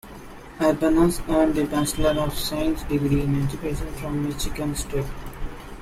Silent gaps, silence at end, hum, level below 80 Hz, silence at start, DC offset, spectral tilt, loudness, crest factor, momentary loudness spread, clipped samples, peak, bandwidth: none; 0 s; none; -34 dBFS; 0.05 s; under 0.1%; -5.5 dB/octave; -24 LUFS; 16 dB; 17 LU; under 0.1%; -6 dBFS; 16 kHz